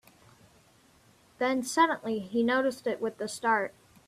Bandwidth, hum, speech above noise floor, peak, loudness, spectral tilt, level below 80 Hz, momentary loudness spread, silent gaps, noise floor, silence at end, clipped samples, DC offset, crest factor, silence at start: 14.5 kHz; none; 33 dB; -10 dBFS; -29 LUFS; -3.5 dB/octave; -72 dBFS; 7 LU; none; -62 dBFS; 0.35 s; under 0.1%; under 0.1%; 20 dB; 1.4 s